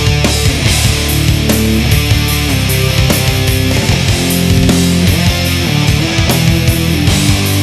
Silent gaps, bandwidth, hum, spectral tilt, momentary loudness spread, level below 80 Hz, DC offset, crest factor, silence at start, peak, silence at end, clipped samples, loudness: none; 14 kHz; none; -4.5 dB/octave; 2 LU; -20 dBFS; under 0.1%; 10 dB; 0 s; 0 dBFS; 0 s; under 0.1%; -11 LUFS